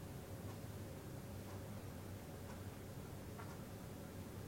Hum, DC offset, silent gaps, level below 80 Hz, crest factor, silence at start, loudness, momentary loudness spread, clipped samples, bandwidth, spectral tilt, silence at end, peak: none; under 0.1%; none; -64 dBFS; 12 dB; 0 s; -52 LUFS; 1 LU; under 0.1%; 16.5 kHz; -6 dB/octave; 0 s; -38 dBFS